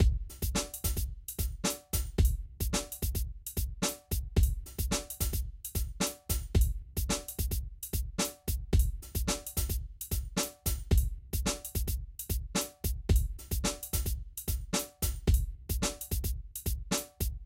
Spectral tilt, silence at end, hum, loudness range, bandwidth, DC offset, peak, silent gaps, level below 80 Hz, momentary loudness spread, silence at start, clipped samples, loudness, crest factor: -4 dB/octave; 0 s; none; 1 LU; 17 kHz; under 0.1%; -14 dBFS; none; -34 dBFS; 6 LU; 0 s; under 0.1%; -34 LUFS; 18 dB